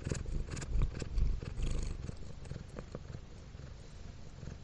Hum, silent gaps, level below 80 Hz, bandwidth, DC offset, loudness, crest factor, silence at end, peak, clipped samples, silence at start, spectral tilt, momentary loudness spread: none; none; -38 dBFS; 10 kHz; under 0.1%; -43 LUFS; 18 dB; 0 s; -18 dBFS; under 0.1%; 0 s; -6 dB/octave; 13 LU